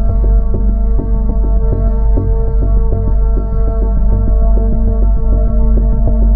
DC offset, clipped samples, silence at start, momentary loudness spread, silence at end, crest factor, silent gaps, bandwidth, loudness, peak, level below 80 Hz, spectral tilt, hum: 0.6%; under 0.1%; 0 s; 2 LU; 0 s; 8 dB; none; 1.7 kHz; -15 LUFS; 0 dBFS; -10 dBFS; -14 dB/octave; none